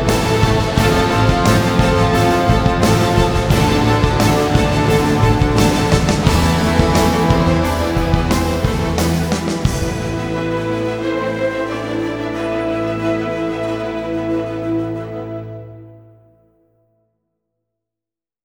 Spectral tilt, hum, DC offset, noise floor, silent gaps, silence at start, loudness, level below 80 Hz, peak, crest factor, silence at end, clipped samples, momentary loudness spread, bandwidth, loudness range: -6 dB/octave; none; under 0.1%; -88 dBFS; none; 0 s; -16 LUFS; -26 dBFS; 0 dBFS; 16 dB; 2.45 s; under 0.1%; 8 LU; over 20 kHz; 10 LU